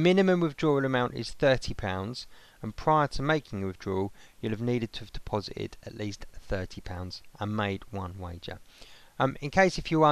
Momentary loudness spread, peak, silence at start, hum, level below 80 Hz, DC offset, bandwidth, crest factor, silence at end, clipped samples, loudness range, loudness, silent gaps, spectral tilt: 16 LU; -10 dBFS; 0 s; none; -46 dBFS; under 0.1%; 13.5 kHz; 20 dB; 0 s; under 0.1%; 8 LU; -30 LUFS; none; -6 dB/octave